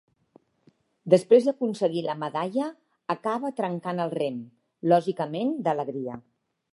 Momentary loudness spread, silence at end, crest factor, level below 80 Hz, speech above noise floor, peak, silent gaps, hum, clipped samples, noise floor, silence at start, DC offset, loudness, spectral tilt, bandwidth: 15 LU; 0.55 s; 22 dB; -76 dBFS; 39 dB; -4 dBFS; none; none; under 0.1%; -64 dBFS; 1.05 s; under 0.1%; -26 LUFS; -7 dB/octave; 11.5 kHz